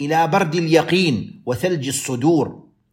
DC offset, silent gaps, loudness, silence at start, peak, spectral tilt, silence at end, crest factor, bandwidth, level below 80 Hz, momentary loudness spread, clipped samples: under 0.1%; none; -19 LUFS; 0 s; -2 dBFS; -5 dB/octave; 0.35 s; 18 dB; 16.5 kHz; -58 dBFS; 8 LU; under 0.1%